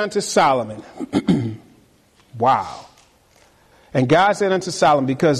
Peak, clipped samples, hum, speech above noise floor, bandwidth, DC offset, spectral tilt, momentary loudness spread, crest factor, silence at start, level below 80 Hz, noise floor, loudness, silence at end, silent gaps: -4 dBFS; under 0.1%; none; 37 dB; 13 kHz; under 0.1%; -5 dB/octave; 16 LU; 14 dB; 0 s; -54 dBFS; -55 dBFS; -18 LUFS; 0 s; none